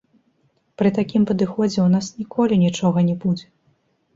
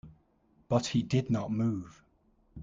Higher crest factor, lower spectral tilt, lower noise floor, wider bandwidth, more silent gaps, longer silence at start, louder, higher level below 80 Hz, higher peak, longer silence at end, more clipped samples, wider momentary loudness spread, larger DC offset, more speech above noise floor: second, 14 dB vs 20 dB; about the same, -7 dB/octave vs -6.5 dB/octave; second, -64 dBFS vs -68 dBFS; second, 7.8 kHz vs 9 kHz; neither; first, 0.8 s vs 0.05 s; first, -20 LUFS vs -31 LUFS; first, -56 dBFS vs -62 dBFS; first, -6 dBFS vs -12 dBFS; first, 0.75 s vs 0 s; neither; about the same, 6 LU vs 8 LU; neither; first, 46 dB vs 38 dB